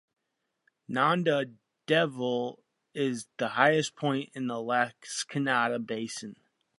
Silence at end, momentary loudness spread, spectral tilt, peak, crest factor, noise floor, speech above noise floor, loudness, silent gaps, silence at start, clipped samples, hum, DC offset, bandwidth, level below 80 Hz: 0.45 s; 13 LU; -4.5 dB/octave; -6 dBFS; 24 dB; -82 dBFS; 53 dB; -29 LUFS; none; 0.9 s; under 0.1%; none; under 0.1%; 11.5 kHz; -80 dBFS